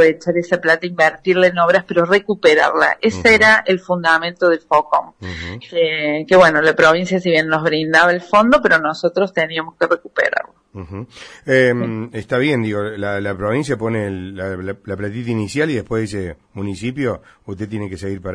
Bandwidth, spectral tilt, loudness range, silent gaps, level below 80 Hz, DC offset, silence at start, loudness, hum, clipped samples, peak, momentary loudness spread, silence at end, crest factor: 10.5 kHz; -5.5 dB/octave; 9 LU; none; -48 dBFS; under 0.1%; 0 s; -16 LUFS; none; under 0.1%; 0 dBFS; 15 LU; 0 s; 16 dB